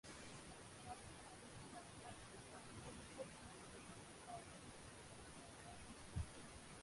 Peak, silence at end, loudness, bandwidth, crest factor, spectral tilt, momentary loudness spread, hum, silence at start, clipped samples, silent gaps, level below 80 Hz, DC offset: -36 dBFS; 0 s; -56 LUFS; 11.5 kHz; 22 dB; -4 dB/octave; 5 LU; none; 0.05 s; under 0.1%; none; -64 dBFS; under 0.1%